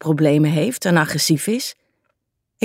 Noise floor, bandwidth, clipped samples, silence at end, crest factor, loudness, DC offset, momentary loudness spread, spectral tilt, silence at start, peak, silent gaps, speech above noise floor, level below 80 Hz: -73 dBFS; 16 kHz; under 0.1%; 0 s; 16 dB; -18 LUFS; under 0.1%; 8 LU; -5 dB/octave; 0.05 s; -4 dBFS; none; 56 dB; -64 dBFS